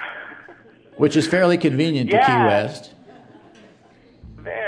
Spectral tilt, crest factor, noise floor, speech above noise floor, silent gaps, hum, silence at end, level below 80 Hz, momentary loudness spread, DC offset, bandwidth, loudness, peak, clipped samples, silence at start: -6 dB/octave; 18 dB; -51 dBFS; 34 dB; none; none; 0 s; -56 dBFS; 21 LU; under 0.1%; 10.5 kHz; -18 LUFS; -4 dBFS; under 0.1%; 0 s